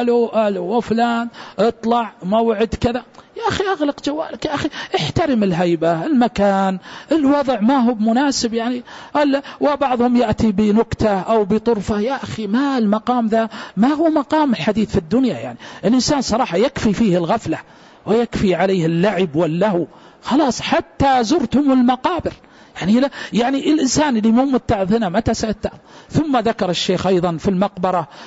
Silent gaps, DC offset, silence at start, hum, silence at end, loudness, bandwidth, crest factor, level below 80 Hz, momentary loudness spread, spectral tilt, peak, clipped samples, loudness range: none; under 0.1%; 0 s; none; 0 s; -18 LUFS; 8 kHz; 14 dB; -42 dBFS; 8 LU; -5.5 dB/octave; -4 dBFS; under 0.1%; 2 LU